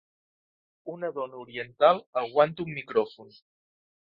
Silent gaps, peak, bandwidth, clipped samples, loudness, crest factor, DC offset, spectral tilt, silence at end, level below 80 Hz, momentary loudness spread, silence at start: 2.06-2.13 s; -8 dBFS; 5.6 kHz; under 0.1%; -27 LUFS; 22 dB; under 0.1%; -8 dB/octave; 0.8 s; -72 dBFS; 15 LU; 0.85 s